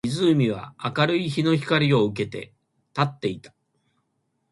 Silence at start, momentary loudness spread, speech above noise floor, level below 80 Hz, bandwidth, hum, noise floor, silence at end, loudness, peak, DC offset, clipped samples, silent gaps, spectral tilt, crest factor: 0.05 s; 13 LU; 51 dB; -60 dBFS; 11.5 kHz; none; -73 dBFS; 1.05 s; -23 LUFS; -6 dBFS; under 0.1%; under 0.1%; none; -6.5 dB/octave; 18 dB